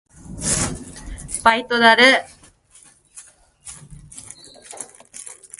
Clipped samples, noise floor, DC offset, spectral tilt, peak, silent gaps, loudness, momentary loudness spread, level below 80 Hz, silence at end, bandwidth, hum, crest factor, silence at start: under 0.1%; -51 dBFS; under 0.1%; -2 dB/octave; 0 dBFS; none; -16 LUFS; 27 LU; -44 dBFS; 0.25 s; 12 kHz; none; 22 dB; 0.3 s